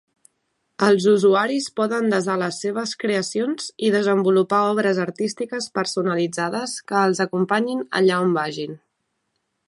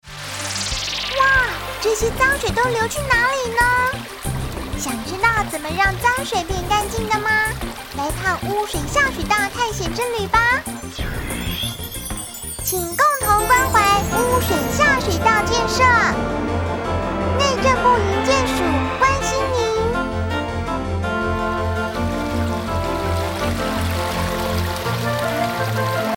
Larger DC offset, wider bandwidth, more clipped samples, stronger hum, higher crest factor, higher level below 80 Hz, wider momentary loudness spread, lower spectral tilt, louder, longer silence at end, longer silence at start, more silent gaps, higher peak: neither; second, 11.5 kHz vs 18 kHz; neither; neither; about the same, 18 dB vs 18 dB; second, -72 dBFS vs -32 dBFS; about the same, 8 LU vs 10 LU; about the same, -5 dB/octave vs -4 dB/octave; about the same, -21 LUFS vs -19 LUFS; first, 0.9 s vs 0 s; first, 0.8 s vs 0.05 s; neither; about the same, -2 dBFS vs -2 dBFS